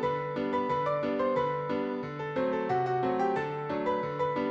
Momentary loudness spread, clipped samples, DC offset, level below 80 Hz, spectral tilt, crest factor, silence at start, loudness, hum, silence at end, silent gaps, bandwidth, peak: 4 LU; under 0.1%; under 0.1%; -64 dBFS; -7.5 dB/octave; 14 dB; 0 s; -30 LUFS; none; 0 s; none; 7.8 kHz; -16 dBFS